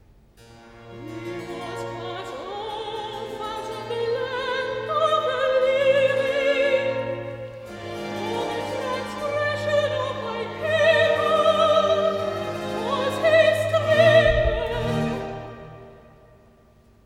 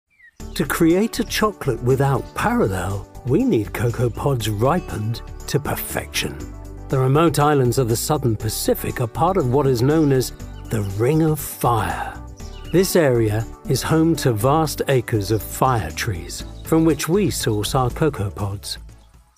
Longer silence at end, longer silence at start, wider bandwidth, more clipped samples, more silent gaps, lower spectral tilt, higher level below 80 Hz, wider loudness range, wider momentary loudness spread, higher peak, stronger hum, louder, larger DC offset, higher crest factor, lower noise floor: first, 1.05 s vs 0.45 s; about the same, 0.5 s vs 0.4 s; about the same, 14.5 kHz vs 15.5 kHz; neither; neither; about the same, -5 dB/octave vs -5.5 dB/octave; second, -42 dBFS vs -36 dBFS; first, 10 LU vs 3 LU; first, 16 LU vs 11 LU; second, -6 dBFS vs -2 dBFS; neither; second, -23 LUFS vs -20 LUFS; second, under 0.1% vs 0.2%; about the same, 18 dB vs 18 dB; first, -55 dBFS vs -46 dBFS